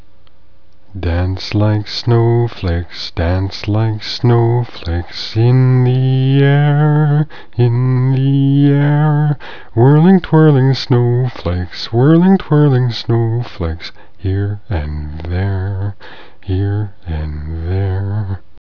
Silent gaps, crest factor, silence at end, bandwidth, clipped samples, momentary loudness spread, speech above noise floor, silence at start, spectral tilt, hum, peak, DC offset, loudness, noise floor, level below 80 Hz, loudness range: none; 14 dB; 0.3 s; 5.4 kHz; under 0.1%; 13 LU; 37 dB; 0.95 s; -8.5 dB/octave; none; 0 dBFS; 3%; -14 LUFS; -50 dBFS; -32 dBFS; 9 LU